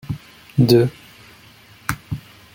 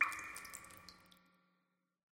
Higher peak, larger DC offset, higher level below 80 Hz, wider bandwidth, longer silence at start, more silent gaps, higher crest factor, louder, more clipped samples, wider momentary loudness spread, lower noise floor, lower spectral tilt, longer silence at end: first, -2 dBFS vs -20 dBFS; neither; first, -46 dBFS vs -78 dBFS; about the same, 17 kHz vs 17 kHz; about the same, 0.1 s vs 0 s; neither; second, 20 dB vs 26 dB; first, -19 LUFS vs -44 LUFS; neither; second, 18 LU vs 22 LU; second, -47 dBFS vs -84 dBFS; first, -6.5 dB/octave vs -0.5 dB/octave; second, 0.4 s vs 1.1 s